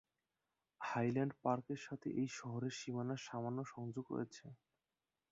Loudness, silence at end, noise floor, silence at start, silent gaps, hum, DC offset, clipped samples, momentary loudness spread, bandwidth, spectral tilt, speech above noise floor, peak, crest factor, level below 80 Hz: -43 LUFS; 0.75 s; under -90 dBFS; 0.8 s; none; none; under 0.1%; under 0.1%; 9 LU; 7.6 kHz; -6 dB/octave; over 48 dB; -24 dBFS; 20 dB; -82 dBFS